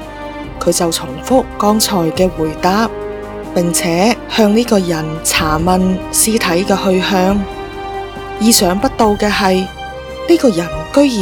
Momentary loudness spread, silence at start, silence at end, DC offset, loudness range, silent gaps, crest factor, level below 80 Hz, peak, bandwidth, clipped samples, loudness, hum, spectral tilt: 13 LU; 0 s; 0 s; under 0.1%; 2 LU; none; 14 dB; -34 dBFS; 0 dBFS; 19.5 kHz; 0.1%; -13 LUFS; none; -4 dB/octave